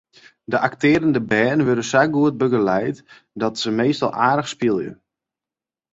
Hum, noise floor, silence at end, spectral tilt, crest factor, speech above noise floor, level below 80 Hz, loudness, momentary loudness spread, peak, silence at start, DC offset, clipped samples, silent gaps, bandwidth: none; -90 dBFS; 1 s; -5.5 dB/octave; 18 dB; 71 dB; -58 dBFS; -19 LUFS; 8 LU; -2 dBFS; 0.5 s; under 0.1%; under 0.1%; none; 8 kHz